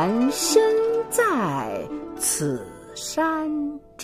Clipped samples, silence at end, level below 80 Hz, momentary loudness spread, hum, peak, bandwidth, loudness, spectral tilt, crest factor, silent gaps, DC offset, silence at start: under 0.1%; 0 s; -54 dBFS; 14 LU; none; -4 dBFS; 15.5 kHz; -23 LUFS; -3.5 dB/octave; 18 dB; none; under 0.1%; 0 s